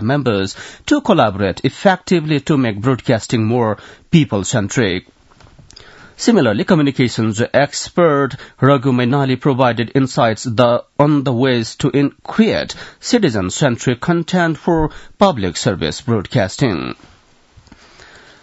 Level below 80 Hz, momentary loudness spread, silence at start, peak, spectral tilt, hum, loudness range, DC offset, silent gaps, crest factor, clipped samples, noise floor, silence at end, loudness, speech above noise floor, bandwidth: -44 dBFS; 5 LU; 0 s; 0 dBFS; -6 dB/octave; none; 3 LU; under 0.1%; none; 16 dB; under 0.1%; -48 dBFS; 1.5 s; -16 LUFS; 33 dB; 8 kHz